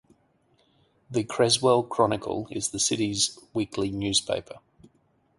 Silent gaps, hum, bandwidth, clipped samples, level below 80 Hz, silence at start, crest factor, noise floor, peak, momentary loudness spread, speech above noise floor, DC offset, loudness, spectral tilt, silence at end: none; none; 11.5 kHz; under 0.1%; -58 dBFS; 1.1 s; 20 dB; -67 dBFS; -6 dBFS; 10 LU; 41 dB; under 0.1%; -25 LUFS; -3.5 dB/octave; 0.8 s